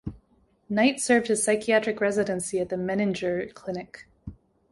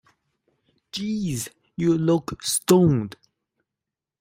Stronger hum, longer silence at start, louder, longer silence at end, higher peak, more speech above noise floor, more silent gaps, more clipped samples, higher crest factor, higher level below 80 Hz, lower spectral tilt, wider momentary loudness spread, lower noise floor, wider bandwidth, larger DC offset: neither; second, 0.05 s vs 0.95 s; second, -25 LUFS vs -22 LUFS; second, 0.4 s vs 1.1 s; second, -8 dBFS vs -4 dBFS; second, 39 dB vs 66 dB; neither; neither; about the same, 20 dB vs 20 dB; about the same, -56 dBFS vs -56 dBFS; second, -4 dB/octave vs -5.5 dB/octave; first, 21 LU vs 15 LU; second, -64 dBFS vs -87 dBFS; second, 11.5 kHz vs 16 kHz; neither